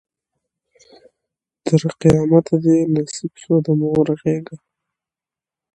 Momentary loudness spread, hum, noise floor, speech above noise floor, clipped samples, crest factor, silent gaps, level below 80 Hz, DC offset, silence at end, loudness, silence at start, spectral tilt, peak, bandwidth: 12 LU; none; -89 dBFS; 73 dB; under 0.1%; 18 dB; none; -50 dBFS; under 0.1%; 1.2 s; -17 LUFS; 1.65 s; -7.5 dB/octave; 0 dBFS; 10.5 kHz